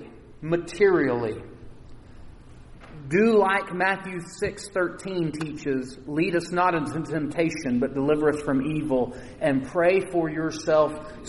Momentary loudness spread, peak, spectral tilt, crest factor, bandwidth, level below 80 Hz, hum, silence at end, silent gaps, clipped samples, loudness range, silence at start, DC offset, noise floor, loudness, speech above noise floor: 10 LU; -8 dBFS; -6 dB/octave; 18 dB; 11.5 kHz; -50 dBFS; none; 0 s; none; under 0.1%; 3 LU; 0 s; under 0.1%; -45 dBFS; -25 LUFS; 21 dB